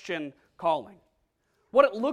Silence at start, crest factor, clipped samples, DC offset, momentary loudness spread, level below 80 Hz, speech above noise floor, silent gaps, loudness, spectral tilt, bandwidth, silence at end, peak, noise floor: 0.05 s; 24 dB; under 0.1%; under 0.1%; 12 LU; -68 dBFS; 47 dB; none; -27 LUFS; -5.5 dB/octave; 9.8 kHz; 0 s; -6 dBFS; -73 dBFS